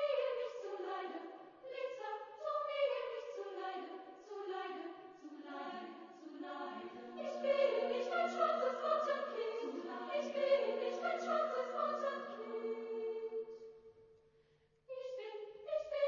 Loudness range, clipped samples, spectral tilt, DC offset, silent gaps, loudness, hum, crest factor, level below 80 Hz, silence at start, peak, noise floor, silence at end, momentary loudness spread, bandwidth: 10 LU; under 0.1%; -0.5 dB/octave; under 0.1%; none; -40 LUFS; none; 20 dB; -88 dBFS; 0 s; -22 dBFS; -73 dBFS; 0 s; 16 LU; 7 kHz